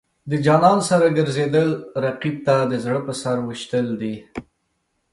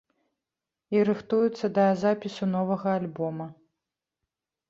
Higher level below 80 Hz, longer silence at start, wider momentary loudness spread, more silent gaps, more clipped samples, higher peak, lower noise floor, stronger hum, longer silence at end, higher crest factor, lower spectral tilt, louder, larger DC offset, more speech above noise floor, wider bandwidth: first, -58 dBFS vs -70 dBFS; second, 0.25 s vs 0.9 s; first, 12 LU vs 9 LU; neither; neither; first, -2 dBFS vs -12 dBFS; second, -71 dBFS vs -88 dBFS; neither; second, 0.7 s vs 1.15 s; about the same, 18 dB vs 16 dB; second, -6 dB/octave vs -8 dB/octave; first, -20 LUFS vs -26 LUFS; neither; second, 52 dB vs 63 dB; first, 11.5 kHz vs 7.6 kHz